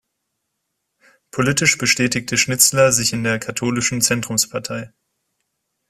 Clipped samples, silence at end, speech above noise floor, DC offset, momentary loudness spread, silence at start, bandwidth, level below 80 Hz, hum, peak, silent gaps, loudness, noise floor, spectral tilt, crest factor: under 0.1%; 1.05 s; 57 dB; under 0.1%; 10 LU; 1.35 s; 16 kHz; -54 dBFS; none; 0 dBFS; none; -17 LUFS; -75 dBFS; -2.5 dB/octave; 20 dB